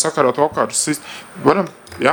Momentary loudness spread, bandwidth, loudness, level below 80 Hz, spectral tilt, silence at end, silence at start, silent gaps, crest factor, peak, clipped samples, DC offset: 10 LU; over 20 kHz; -18 LUFS; -56 dBFS; -3.5 dB/octave; 0 s; 0 s; none; 18 dB; 0 dBFS; under 0.1%; under 0.1%